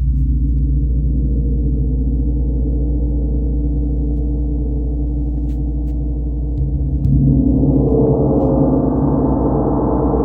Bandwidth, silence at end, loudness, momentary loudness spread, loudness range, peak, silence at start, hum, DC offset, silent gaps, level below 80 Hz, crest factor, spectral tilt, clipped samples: 1.6 kHz; 0 s; -17 LUFS; 7 LU; 6 LU; -2 dBFS; 0 s; none; under 0.1%; none; -18 dBFS; 14 dB; -14 dB/octave; under 0.1%